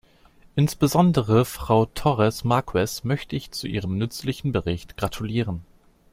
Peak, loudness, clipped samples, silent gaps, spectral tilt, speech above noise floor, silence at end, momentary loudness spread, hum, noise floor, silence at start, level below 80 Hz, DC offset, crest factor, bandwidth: -4 dBFS; -24 LUFS; under 0.1%; none; -6.5 dB/octave; 31 dB; 0.5 s; 11 LU; none; -54 dBFS; 0.55 s; -44 dBFS; under 0.1%; 18 dB; 16.5 kHz